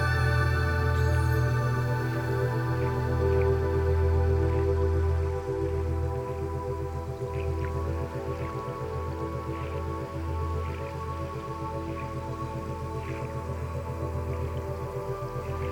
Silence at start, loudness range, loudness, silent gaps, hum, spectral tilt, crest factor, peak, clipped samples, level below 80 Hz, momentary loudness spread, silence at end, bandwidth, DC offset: 0 s; 7 LU; -30 LUFS; none; none; -7.5 dB/octave; 14 dB; -14 dBFS; under 0.1%; -36 dBFS; 9 LU; 0 s; 17 kHz; under 0.1%